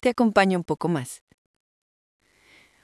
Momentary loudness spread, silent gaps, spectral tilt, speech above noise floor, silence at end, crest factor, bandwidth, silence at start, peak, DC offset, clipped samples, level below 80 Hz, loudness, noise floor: 17 LU; none; -6 dB/octave; 35 dB; 1.7 s; 24 dB; 12 kHz; 0.05 s; -4 dBFS; under 0.1%; under 0.1%; -62 dBFS; -23 LUFS; -57 dBFS